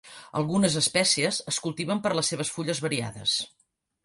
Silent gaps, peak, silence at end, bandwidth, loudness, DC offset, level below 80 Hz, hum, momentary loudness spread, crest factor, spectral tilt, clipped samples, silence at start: none; -10 dBFS; 0.55 s; 11.5 kHz; -26 LUFS; under 0.1%; -64 dBFS; none; 8 LU; 18 dB; -3 dB/octave; under 0.1%; 0.05 s